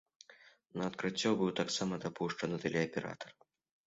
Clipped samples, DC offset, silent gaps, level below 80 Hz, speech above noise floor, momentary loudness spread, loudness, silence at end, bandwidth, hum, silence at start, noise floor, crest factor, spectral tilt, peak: under 0.1%; under 0.1%; none; -72 dBFS; 26 dB; 13 LU; -36 LUFS; 0.55 s; 7.6 kHz; none; 0.3 s; -62 dBFS; 20 dB; -4 dB/octave; -18 dBFS